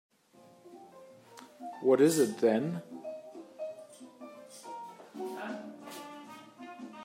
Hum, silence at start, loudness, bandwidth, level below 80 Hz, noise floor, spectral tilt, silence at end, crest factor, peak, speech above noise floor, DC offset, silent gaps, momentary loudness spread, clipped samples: none; 0.65 s; -31 LUFS; 16 kHz; -86 dBFS; -60 dBFS; -5.5 dB/octave; 0 s; 22 dB; -14 dBFS; 33 dB; under 0.1%; none; 27 LU; under 0.1%